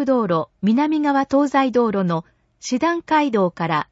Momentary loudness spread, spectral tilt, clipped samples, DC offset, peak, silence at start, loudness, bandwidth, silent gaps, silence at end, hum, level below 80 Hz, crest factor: 6 LU; -6 dB/octave; under 0.1%; under 0.1%; -6 dBFS; 0 s; -19 LUFS; 8 kHz; none; 0.1 s; none; -60 dBFS; 12 dB